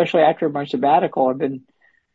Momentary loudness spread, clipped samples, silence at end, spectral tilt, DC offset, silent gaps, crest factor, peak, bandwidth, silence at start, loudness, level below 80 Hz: 9 LU; under 0.1%; 0.55 s; -7.5 dB/octave; under 0.1%; none; 16 dB; -4 dBFS; 7.6 kHz; 0 s; -19 LUFS; -66 dBFS